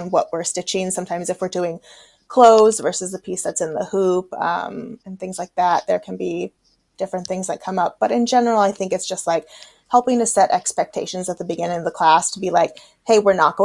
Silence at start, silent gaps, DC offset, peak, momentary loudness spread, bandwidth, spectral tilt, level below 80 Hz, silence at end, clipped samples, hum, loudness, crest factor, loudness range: 0 s; none; under 0.1%; 0 dBFS; 12 LU; 12 kHz; -3.5 dB/octave; -64 dBFS; 0 s; under 0.1%; none; -19 LUFS; 20 dB; 5 LU